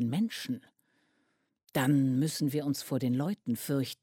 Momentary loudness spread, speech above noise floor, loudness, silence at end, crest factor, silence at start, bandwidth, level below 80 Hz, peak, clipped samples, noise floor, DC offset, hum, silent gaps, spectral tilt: 9 LU; 45 dB; -31 LUFS; 0.1 s; 16 dB; 0 s; 16.5 kHz; -72 dBFS; -16 dBFS; under 0.1%; -76 dBFS; under 0.1%; none; none; -6 dB/octave